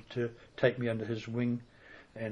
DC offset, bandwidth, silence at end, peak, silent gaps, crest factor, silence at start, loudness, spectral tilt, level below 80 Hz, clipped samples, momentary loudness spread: under 0.1%; 9.4 kHz; 0 s; -12 dBFS; none; 22 dB; 0 s; -34 LUFS; -7.5 dB/octave; -66 dBFS; under 0.1%; 21 LU